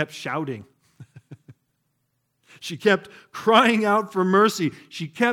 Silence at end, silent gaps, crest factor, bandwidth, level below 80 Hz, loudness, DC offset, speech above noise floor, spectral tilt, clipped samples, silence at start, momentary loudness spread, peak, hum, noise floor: 0 s; none; 22 dB; 17.5 kHz; -74 dBFS; -21 LUFS; under 0.1%; 52 dB; -5 dB/octave; under 0.1%; 0 s; 18 LU; -2 dBFS; none; -73 dBFS